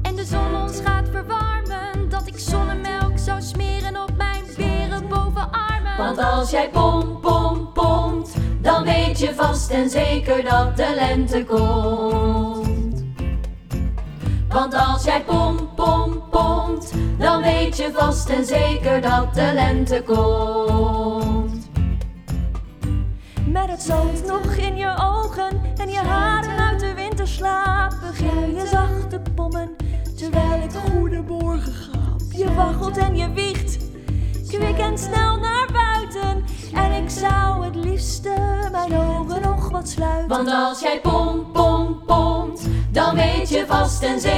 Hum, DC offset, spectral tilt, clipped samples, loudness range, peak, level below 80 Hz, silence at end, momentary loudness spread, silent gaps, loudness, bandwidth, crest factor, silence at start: none; under 0.1%; -6 dB/octave; under 0.1%; 4 LU; -2 dBFS; -24 dBFS; 0 s; 7 LU; none; -21 LUFS; 14.5 kHz; 18 dB; 0 s